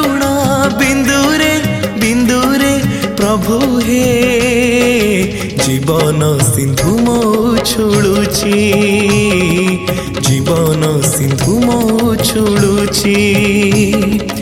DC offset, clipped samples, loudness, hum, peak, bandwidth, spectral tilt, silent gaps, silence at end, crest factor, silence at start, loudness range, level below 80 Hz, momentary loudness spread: under 0.1%; under 0.1%; -11 LUFS; none; 0 dBFS; 17 kHz; -5 dB/octave; none; 0 s; 12 dB; 0 s; 1 LU; -32 dBFS; 3 LU